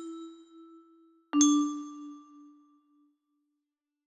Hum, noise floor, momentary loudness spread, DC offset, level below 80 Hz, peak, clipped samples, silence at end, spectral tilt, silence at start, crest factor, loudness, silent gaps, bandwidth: none; -87 dBFS; 24 LU; under 0.1%; -82 dBFS; -10 dBFS; under 0.1%; 1.85 s; -1 dB/octave; 0 s; 24 dB; -27 LUFS; none; 11.5 kHz